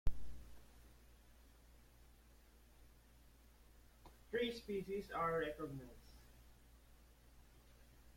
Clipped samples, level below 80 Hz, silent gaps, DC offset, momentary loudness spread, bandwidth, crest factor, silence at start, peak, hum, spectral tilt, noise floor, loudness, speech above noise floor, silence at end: under 0.1%; -56 dBFS; none; under 0.1%; 26 LU; 16.5 kHz; 24 dB; 0.05 s; -22 dBFS; none; -5.5 dB/octave; -66 dBFS; -44 LUFS; 22 dB; 0.05 s